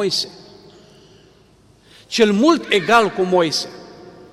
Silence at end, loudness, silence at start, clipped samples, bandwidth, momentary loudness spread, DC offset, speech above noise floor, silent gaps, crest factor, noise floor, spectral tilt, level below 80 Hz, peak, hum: 0.25 s; -16 LUFS; 0 s; under 0.1%; 15.5 kHz; 15 LU; under 0.1%; 35 dB; none; 16 dB; -51 dBFS; -4 dB/octave; -58 dBFS; -2 dBFS; none